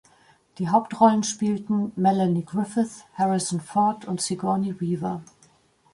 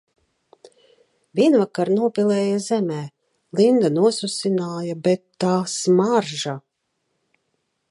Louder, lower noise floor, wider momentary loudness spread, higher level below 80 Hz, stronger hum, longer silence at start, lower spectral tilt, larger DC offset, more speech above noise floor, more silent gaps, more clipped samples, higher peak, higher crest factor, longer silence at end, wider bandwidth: second, -24 LUFS vs -20 LUFS; second, -60 dBFS vs -74 dBFS; about the same, 9 LU vs 11 LU; first, -66 dBFS vs -72 dBFS; neither; second, 0.6 s vs 1.35 s; about the same, -5.5 dB/octave vs -5.5 dB/octave; neither; second, 37 dB vs 55 dB; neither; neither; about the same, -6 dBFS vs -4 dBFS; about the same, 20 dB vs 16 dB; second, 0.7 s vs 1.3 s; about the same, 11.5 kHz vs 11.5 kHz